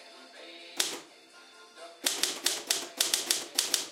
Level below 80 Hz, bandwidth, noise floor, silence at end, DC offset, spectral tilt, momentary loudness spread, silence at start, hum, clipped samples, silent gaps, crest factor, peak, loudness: -86 dBFS; 16.5 kHz; -54 dBFS; 0 s; under 0.1%; 2 dB/octave; 20 LU; 0 s; none; under 0.1%; none; 28 dB; -6 dBFS; -29 LUFS